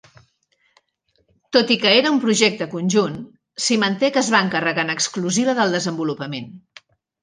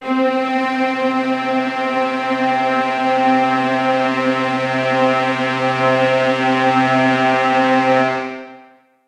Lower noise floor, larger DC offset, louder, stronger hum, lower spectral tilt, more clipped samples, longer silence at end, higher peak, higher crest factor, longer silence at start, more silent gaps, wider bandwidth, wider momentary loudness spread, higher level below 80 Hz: first, -67 dBFS vs -47 dBFS; neither; second, -19 LUFS vs -16 LUFS; neither; second, -3.5 dB/octave vs -5.5 dB/octave; neither; first, 0.65 s vs 0.45 s; about the same, -2 dBFS vs -2 dBFS; first, 20 dB vs 14 dB; first, 1.5 s vs 0 s; neither; about the same, 10 kHz vs 10.5 kHz; first, 13 LU vs 4 LU; about the same, -66 dBFS vs -64 dBFS